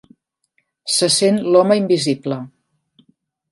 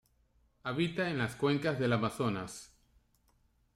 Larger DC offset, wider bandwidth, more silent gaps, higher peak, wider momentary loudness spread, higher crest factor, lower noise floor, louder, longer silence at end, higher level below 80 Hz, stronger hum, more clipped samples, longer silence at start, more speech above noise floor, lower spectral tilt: neither; second, 11.5 kHz vs 15 kHz; neither; first, 0 dBFS vs -18 dBFS; first, 15 LU vs 12 LU; about the same, 18 dB vs 18 dB; second, -67 dBFS vs -71 dBFS; first, -16 LUFS vs -33 LUFS; about the same, 1.05 s vs 1.1 s; about the same, -66 dBFS vs -64 dBFS; neither; neither; first, 0.85 s vs 0.65 s; first, 52 dB vs 38 dB; second, -4 dB/octave vs -6 dB/octave